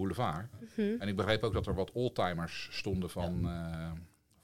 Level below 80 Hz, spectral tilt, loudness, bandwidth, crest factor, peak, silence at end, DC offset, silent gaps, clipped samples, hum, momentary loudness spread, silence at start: -52 dBFS; -6.5 dB/octave; -36 LUFS; 16.5 kHz; 22 dB; -14 dBFS; 0 s; under 0.1%; none; under 0.1%; none; 10 LU; 0 s